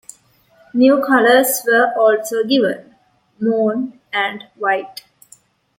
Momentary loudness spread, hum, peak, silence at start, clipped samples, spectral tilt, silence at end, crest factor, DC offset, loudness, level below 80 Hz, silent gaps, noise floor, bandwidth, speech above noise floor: 12 LU; none; -2 dBFS; 0.75 s; under 0.1%; -3.5 dB/octave; 0.85 s; 16 dB; under 0.1%; -16 LUFS; -68 dBFS; none; -53 dBFS; 16.5 kHz; 38 dB